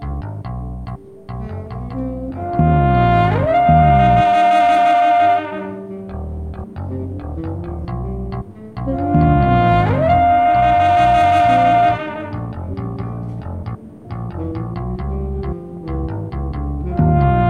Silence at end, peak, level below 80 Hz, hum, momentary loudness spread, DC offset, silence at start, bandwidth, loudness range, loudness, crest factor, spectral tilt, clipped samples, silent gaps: 0 s; 0 dBFS; -28 dBFS; none; 16 LU; under 0.1%; 0 s; 9.2 kHz; 13 LU; -16 LUFS; 16 dB; -8.5 dB/octave; under 0.1%; none